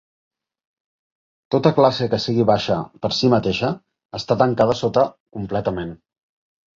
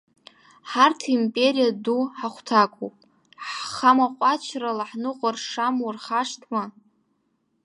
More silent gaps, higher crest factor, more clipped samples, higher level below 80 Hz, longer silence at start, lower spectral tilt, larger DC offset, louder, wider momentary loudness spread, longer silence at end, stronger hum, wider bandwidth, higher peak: first, 4.05-4.09 s, 5.20-5.26 s vs none; about the same, 20 dB vs 22 dB; neither; first, -50 dBFS vs -76 dBFS; first, 1.5 s vs 0.65 s; first, -6.5 dB/octave vs -3.5 dB/octave; neither; first, -19 LUFS vs -23 LUFS; about the same, 13 LU vs 12 LU; second, 0.8 s vs 0.95 s; neither; second, 7.6 kHz vs 11 kHz; about the same, 0 dBFS vs -2 dBFS